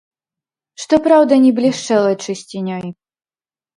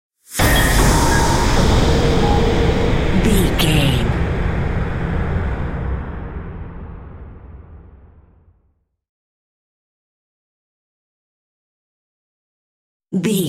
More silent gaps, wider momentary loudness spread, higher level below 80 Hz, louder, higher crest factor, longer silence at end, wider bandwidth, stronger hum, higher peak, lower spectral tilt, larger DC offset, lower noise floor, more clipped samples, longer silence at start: second, none vs 9.09-13.00 s; second, 15 LU vs 18 LU; second, -58 dBFS vs -24 dBFS; about the same, -15 LUFS vs -17 LUFS; about the same, 16 dB vs 18 dB; first, 0.85 s vs 0 s; second, 11.5 kHz vs 16.5 kHz; neither; about the same, 0 dBFS vs -2 dBFS; about the same, -5.5 dB/octave vs -5 dB/octave; neither; first, under -90 dBFS vs -63 dBFS; neither; first, 0.8 s vs 0.3 s